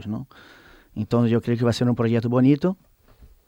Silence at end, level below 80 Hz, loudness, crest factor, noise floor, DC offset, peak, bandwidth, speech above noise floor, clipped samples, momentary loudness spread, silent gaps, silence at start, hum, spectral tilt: 0.75 s; -56 dBFS; -22 LUFS; 16 dB; -52 dBFS; under 0.1%; -6 dBFS; 15.5 kHz; 30 dB; under 0.1%; 17 LU; none; 0 s; none; -8 dB/octave